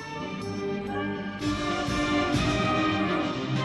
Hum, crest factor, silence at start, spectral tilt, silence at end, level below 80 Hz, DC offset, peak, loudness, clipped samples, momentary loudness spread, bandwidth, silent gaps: none; 14 dB; 0 s; -5.5 dB/octave; 0 s; -44 dBFS; under 0.1%; -14 dBFS; -28 LUFS; under 0.1%; 8 LU; 12 kHz; none